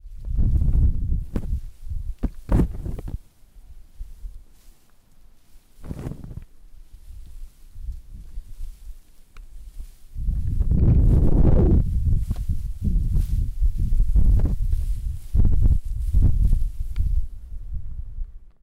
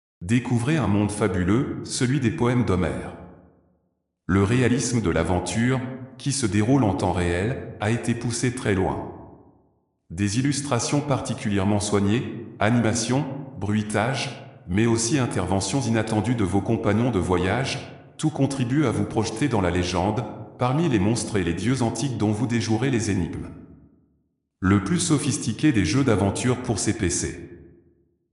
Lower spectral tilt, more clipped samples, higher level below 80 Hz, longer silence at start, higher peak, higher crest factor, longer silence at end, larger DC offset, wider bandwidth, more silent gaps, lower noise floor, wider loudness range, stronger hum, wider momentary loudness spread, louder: first, -9.5 dB/octave vs -5.5 dB/octave; neither; first, -24 dBFS vs -50 dBFS; second, 0.05 s vs 0.2 s; second, -10 dBFS vs -6 dBFS; about the same, 12 dB vs 16 dB; second, 0.15 s vs 0.7 s; neither; second, 2.7 kHz vs 11 kHz; neither; second, -51 dBFS vs -73 dBFS; first, 20 LU vs 3 LU; neither; first, 23 LU vs 8 LU; about the same, -24 LUFS vs -23 LUFS